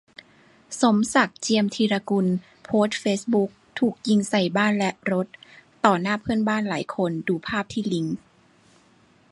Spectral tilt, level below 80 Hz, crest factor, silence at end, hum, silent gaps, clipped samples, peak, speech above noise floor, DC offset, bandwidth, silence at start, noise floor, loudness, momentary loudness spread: -5 dB/octave; -60 dBFS; 22 dB; 1.15 s; none; none; under 0.1%; -2 dBFS; 35 dB; under 0.1%; 11.5 kHz; 0.7 s; -58 dBFS; -23 LUFS; 7 LU